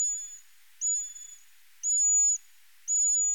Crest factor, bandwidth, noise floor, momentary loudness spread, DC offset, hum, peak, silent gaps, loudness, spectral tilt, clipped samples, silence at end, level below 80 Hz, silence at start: 10 dB; 18 kHz; -60 dBFS; 21 LU; 0.2%; none; -18 dBFS; none; -25 LUFS; 6.5 dB/octave; under 0.1%; 0 s; under -90 dBFS; 0 s